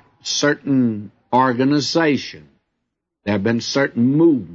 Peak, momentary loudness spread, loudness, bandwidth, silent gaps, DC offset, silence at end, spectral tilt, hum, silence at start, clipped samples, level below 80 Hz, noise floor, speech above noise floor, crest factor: -4 dBFS; 8 LU; -18 LUFS; 7.8 kHz; none; under 0.1%; 0 s; -5 dB/octave; none; 0.25 s; under 0.1%; -62 dBFS; -77 dBFS; 60 dB; 16 dB